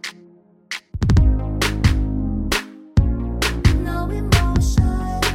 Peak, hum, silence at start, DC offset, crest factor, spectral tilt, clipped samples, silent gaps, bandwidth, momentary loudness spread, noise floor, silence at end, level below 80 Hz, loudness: 0 dBFS; none; 0.05 s; under 0.1%; 18 dB; -5.5 dB/octave; under 0.1%; none; 16.5 kHz; 7 LU; -50 dBFS; 0 s; -22 dBFS; -20 LUFS